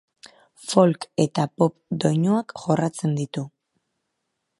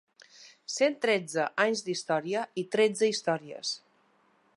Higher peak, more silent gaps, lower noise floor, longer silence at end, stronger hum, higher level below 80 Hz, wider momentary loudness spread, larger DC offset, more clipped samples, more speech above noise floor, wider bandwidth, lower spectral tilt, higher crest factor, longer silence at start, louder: first, -2 dBFS vs -10 dBFS; neither; first, -78 dBFS vs -67 dBFS; first, 1.1 s vs 0.8 s; neither; first, -68 dBFS vs -84 dBFS; about the same, 11 LU vs 9 LU; neither; neither; first, 56 dB vs 38 dB; about the same, 11.5 kHz vs 11.5 kHz; first, -6.5 dB/octave vs -3.5 dB/octave; about the same, 22 dB vs 20 dB; first, 0.6 s vs 0.4 s; first, -23 LUFS vs -29 LUFS